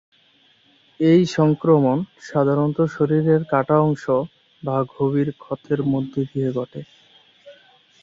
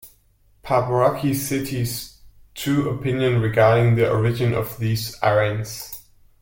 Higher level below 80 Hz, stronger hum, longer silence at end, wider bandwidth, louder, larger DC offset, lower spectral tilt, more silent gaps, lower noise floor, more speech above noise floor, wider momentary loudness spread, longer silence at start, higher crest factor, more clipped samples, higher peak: second, -60 dBFS vs -48 dBFS; neither; about the same, 0.5 s vs 0.4 s; second, 7.6 kHz vs 17 kHz; about the same, -20 LUFS vs -21 LUFS; neither; first, -8.5 dB/octave vs -6 dB/octave; neither; about the same, -58 dBFS vs -58 dBFS; about the same, 38 dB vs 38 dB; second, 10 LU vs 14 LU; first, 1 s vs 0.05 s; about the same, 18 dB vs 16 dB; neither; about the same, -4 dBFS vs -4 dBFS